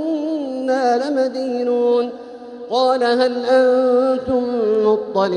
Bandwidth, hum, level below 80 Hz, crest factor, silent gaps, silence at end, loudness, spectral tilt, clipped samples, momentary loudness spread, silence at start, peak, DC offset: 9.8 kHz; none; -58 dBFS; 14 dB; none; 0 s; -18 LUFS; -5.5 dB/octave; under 0.1%; 8 LU; 0 s; -4 dBFS; under 0.1%